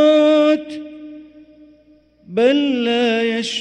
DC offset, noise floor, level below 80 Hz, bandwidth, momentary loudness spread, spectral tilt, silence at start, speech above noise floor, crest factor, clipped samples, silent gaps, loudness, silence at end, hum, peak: under 0.1%; -52 dBFS; -62 dBFS; 9.4 kHz; 21 LU; -4 dB/octave; 0 s; 34 dB; 14 dB; under 0.1%; none; -16 LUFS; 0 s; 60 Hz at -55 dBFS; -4 dBFS